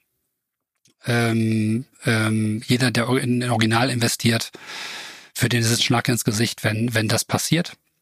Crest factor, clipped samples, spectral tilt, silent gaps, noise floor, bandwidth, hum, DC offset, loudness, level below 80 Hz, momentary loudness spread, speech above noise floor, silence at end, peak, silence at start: 20 dB; under 0.1%; -4.5 dB/octave; none; -80 dBFS; 15.5 kHz; none; under 0.1%; -21 LUFS; -58 dBFS; 12 LU; 59 dB; 0.3 s; -2 dBFS; 1.05 s